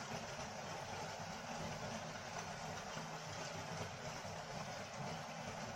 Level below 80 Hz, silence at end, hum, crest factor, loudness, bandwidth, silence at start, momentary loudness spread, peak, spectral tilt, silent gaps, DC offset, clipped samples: -68 dBFS; 0 s; none; 16 dB; -47 LUFS; 16 kHz; 0 s; 1 LU; -32 dBFS; -3.5 dB/octave; none; under 0.1%; under 0.1%